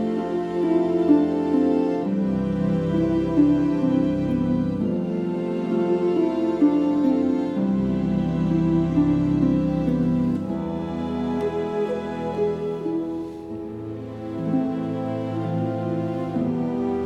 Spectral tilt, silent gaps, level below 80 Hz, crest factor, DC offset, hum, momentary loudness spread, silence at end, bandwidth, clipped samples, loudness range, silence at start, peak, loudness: -9.5 dB/octave; none; -46 dBFS; 16 dB; under 0.1%; none; 8 LU; 0 s; 8 kHz; under 0.1%; 6 LU; 0 s; -6 dBFS; -23 LUFS